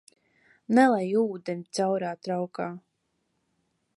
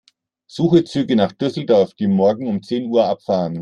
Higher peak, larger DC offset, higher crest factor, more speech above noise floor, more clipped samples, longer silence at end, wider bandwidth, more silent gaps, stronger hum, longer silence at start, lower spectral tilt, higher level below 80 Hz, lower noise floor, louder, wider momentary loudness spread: second, -8 dBFS vs -2 dBFS; neither; first, 22 dB vs 16 dB; first, 50 dB vs 34 dB; neither; first, 1.2 s vs 0 s; about the same, 11.5 kHz vs 10.5 kHz; neither; neither; first, 0.7 s vs 0.55 s; second, -6 dB/octave vs -8 dB/octave; second, -78 dBFS vs -60 dBFS; first, -76 dBFS vs -52 dBFS; second, -27 LUFS vs -18 LUFS; first, 14 LU vs 7 LU